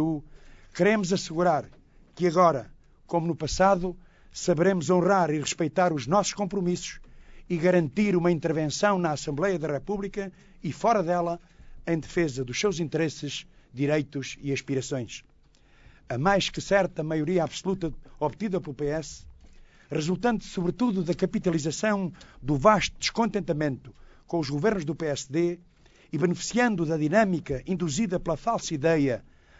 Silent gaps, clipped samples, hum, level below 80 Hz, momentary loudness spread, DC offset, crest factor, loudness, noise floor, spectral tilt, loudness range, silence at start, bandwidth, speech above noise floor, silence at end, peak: none; under 0.1%; none; -50 dBFS; 12 LU; under 0.1%; 22 dB; -27 LUFS; -58 dBFS; -5.5 dB/octave; 4 LU; 0 s; 8 kHz; 32 dB; 0.4 s; -6 dBFS